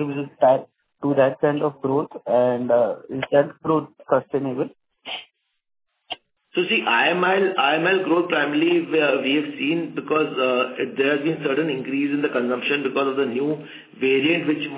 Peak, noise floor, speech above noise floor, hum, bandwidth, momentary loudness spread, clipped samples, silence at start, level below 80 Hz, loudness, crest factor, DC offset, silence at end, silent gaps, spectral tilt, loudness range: -4 dBFS; -49 dBFS; 28 dB; none; 4 kHz; 10 LU; under 0.1%; 0 s; -70 dBFS; -21 LUFS; 18 dB; under 0.1%; 0 s; none; -9.5 dB/octave; 5 LU